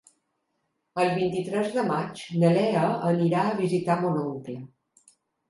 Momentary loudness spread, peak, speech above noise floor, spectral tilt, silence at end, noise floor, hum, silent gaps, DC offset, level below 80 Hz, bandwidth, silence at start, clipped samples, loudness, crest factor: 11 LU; -8 dBFS; 52 dB; -7.5 dB/octave; 0.85 s; -77 dBFS; none; none; under 0.1%; -70 dBFS; 11.5 kHz; 0.95 s; under 0.1%; -25 LUFS; 18 dB